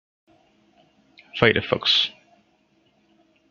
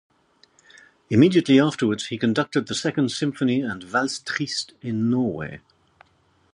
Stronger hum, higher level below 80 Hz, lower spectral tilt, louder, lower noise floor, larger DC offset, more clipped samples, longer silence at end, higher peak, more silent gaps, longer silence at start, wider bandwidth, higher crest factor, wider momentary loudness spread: neither; about the same, -60 dBFS vs -60 dBFS; about the same, -4.5 dB/octave vs -5.5 dB/octave; about the same, -20 LUFS vs -22 LUFS; about the same, -64 dBFS vs -62 dBFS; neither; neither; first, 1.4 s vs 0.95 s; first, 0 dBFS vs -4 dBFS; neither; first, 1.35 s vs 1.1 s; second, 7.4 kHz vs 11 kHz; first, 26 dB vs 20 dB; about the same, 8 LU vs 10 LU